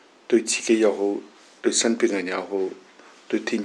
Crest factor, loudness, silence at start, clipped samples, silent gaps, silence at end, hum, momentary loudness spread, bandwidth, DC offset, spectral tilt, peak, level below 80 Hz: 16 dB; -23 LUFS; 0.3 s; under 0.1%; none; 0 s; none; 9 LU; 11.5 kHz; under 0.1%; -2.5 dB/octave; -8 dBFS; -86 dBFS